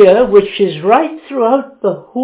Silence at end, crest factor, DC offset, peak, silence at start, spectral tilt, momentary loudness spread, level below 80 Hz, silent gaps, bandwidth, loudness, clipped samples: 0 s; 12 dB; under 0.1%; 0 dBFS; 0 s; -10 dB/octave; 10 LU; -48 dBFS; none; 4 kHz; -12 LUFS; 0.9%